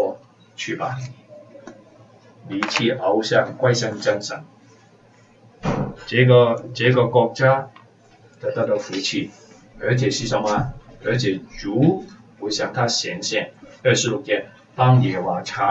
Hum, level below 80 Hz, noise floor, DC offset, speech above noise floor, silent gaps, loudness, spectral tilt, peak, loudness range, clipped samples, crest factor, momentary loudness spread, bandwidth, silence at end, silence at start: none; -50 dBFS; -52 dBFS; under 0.1%; 32 dB; none; -21 LUFS; -5 dB/octave; -2 dBFS; 5 LU; under 0.1%; 20 dB; 14 LU; 8 kHz; 0 s; 0 s